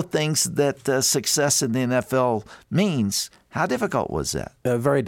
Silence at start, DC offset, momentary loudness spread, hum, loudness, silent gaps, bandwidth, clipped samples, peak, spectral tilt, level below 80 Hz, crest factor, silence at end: 0 s; under 0.1%; 8 LU; none; -22 LUFS; none; 17 kHz; under 0.1%; -6 dBFS; -4 dB/octave; -50 dBFS; 16 dB; 0 s